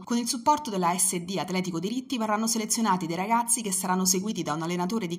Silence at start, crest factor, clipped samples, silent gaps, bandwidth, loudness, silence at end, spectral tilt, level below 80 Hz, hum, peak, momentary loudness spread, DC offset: 0 s; 18 dB; under 0.1%; none; 16 kHz; -26 LUFS; 0 s; -3.5 dB/octave; -70 dBFS; none; -10 dBFS; 6 LU; under 0.1%